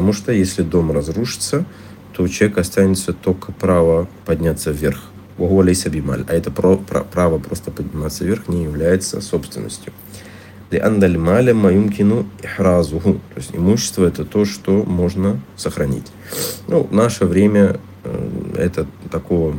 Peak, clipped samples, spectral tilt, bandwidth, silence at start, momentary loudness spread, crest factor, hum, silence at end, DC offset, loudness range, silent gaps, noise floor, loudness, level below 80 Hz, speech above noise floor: -2 dBFS; under 0.1%; -6 dB/octave; 17 kHz; 0 s; 13 LU; 16 dB; none; 0 s; under 0.1%; 4 LU; none; -38 dBFS; -17 LUFS; -40 dBFS; 21 dB